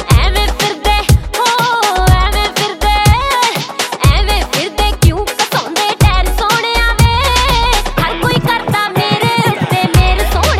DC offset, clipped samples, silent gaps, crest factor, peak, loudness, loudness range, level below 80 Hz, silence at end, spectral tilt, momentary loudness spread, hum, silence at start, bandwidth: under 0.1%; under 0.1%; none; 12 dB; 0 dBFS; -12 LUFS; 1 LU; -16 dBFS; 0 s; -4 dB/octave; 4 LU; none; 0 s; 17 kHz